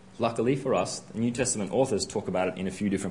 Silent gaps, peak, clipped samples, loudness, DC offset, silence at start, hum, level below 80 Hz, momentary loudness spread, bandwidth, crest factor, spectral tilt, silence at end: none; -10 dBFS; under 0.1%; -28 LUFS; 0.1%; 0.05 s; none; -60 dBFS; 4 LU; 11 kHz; 18 dB; -5 dB/octave; 0 s